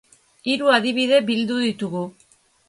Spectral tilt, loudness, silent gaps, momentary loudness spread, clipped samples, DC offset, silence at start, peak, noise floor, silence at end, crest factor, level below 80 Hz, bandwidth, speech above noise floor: -4.5 dB/octave; -20 LUFS; none; 12 LU; under 0.1%; under 0.1%; 0.45 s; -4 dBFS; -58 dBFS; 0.6 s; 18 dB; -68 dBFS; 11.5 kHz; 38 dB